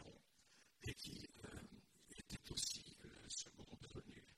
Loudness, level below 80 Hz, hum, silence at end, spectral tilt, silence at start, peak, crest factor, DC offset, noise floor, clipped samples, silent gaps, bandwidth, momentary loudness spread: -51 LUFS; -68 dBFS; none; 0 s; -2.5 dB/octave; 0 s; -30 dBFS; 26 dB; under 0.1%; -73 dBFS; under 0.1%; none; 16 kHz; 18 LU